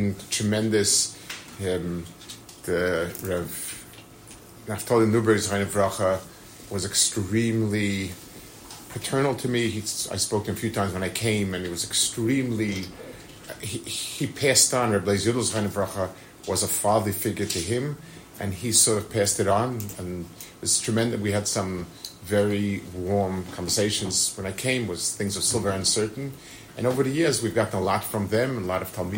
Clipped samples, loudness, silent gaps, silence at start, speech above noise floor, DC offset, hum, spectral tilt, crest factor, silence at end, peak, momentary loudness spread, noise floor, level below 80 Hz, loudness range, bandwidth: under 0.1%; -25 LUFS; none; 0 s; 21 dB; under 0.1%; none; -3.5 dB/octave; 20 dB; 0 s; -6 dBFS; 17 LU; -46 dBFS; -56 dBFS; 3 LU; 16.5 kHz